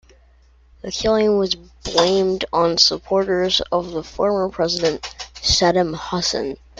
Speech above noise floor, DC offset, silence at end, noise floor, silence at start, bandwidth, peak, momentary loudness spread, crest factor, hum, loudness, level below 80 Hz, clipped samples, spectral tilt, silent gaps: 33 dB; under 0.1%; 0.25 s; -52 dBFS; 0.85 s; 9.2 kHz; 0 dBFS; 10 LU; 20 dB; none; -19 LUFS; -42 dBFS; under 0.1%; -3.5 dB/octave; none